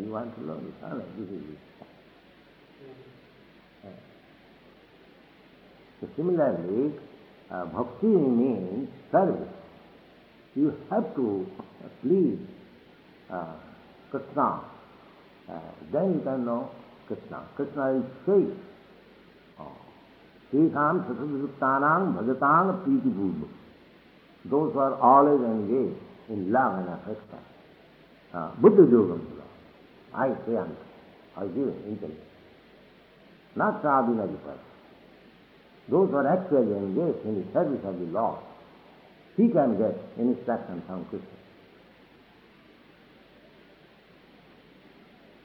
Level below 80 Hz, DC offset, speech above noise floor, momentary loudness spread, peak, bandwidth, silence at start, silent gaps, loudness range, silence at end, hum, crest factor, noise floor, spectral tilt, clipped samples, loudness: -68 dBFS; under 0.1%; 30 dB; 20 LU; -6 dBFS; 5 kHz; 0 s; none; 10 LU; 4.15 s; none; 24 dB; -56 dBFS; -10.5 dB/octave; under 0.1%; -26 LUFS